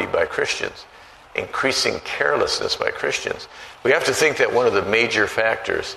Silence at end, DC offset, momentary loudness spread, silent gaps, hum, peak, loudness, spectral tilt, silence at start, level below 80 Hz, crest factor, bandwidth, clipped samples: 0 s; under 0.1%; 11 LU; none; none; -2 dBFS; -20 LUFS; -2.5 dB/octave; 0 s; -52 dBFS; 20 dB; 13.5 kHz; under 0.1%